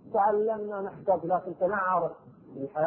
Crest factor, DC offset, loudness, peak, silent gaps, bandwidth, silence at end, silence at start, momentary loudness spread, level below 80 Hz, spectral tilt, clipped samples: 16 dB; under 0.1%; -29 LUFS; -14 dBFS; none; 3.3 kHz; 0 s; 0.05 s; 10 LU; -68 dBFS; -11 dB/octave; under 0.1%